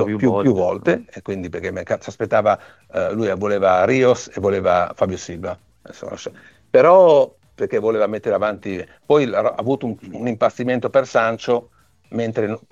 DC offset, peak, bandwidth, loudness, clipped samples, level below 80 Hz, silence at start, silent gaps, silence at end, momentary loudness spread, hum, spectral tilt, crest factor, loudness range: under 0.1%; -2 dBFS; 7.8 kHz; -19 LUFS; under 0.1%; -56 dBFS; 0 s; none; 0.15 s; 14 LU; none; -6.5 dB/octave; 16 dB; 4 LU